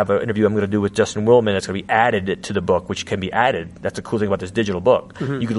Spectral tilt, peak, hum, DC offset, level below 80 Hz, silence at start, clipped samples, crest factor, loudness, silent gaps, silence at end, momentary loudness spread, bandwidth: -5.5 dB/octave; 0 dBFS; none; under 0.1%; -50 dBFS; 0 s; under 0.1%; 18 dB; -19 LUFS; none; 0 s; 9 LU; 11.5 kHz